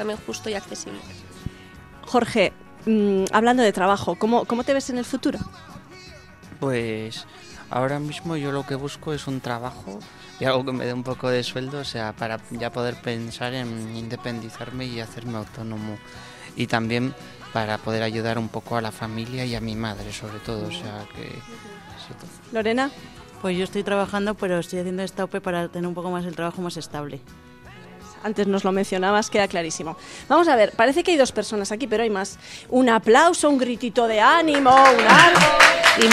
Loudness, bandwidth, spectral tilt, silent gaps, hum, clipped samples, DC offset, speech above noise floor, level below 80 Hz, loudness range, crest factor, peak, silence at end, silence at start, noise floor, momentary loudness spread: -21 LUFS; 16 kHz; -4 dB/octave; none; none; under 0.1%; under 0.1%; 22 dB; -52 dBFS; 11 LU; 22 dB; 0 dBFS; 0 s; 0 s; -44 dBFS; 21 LU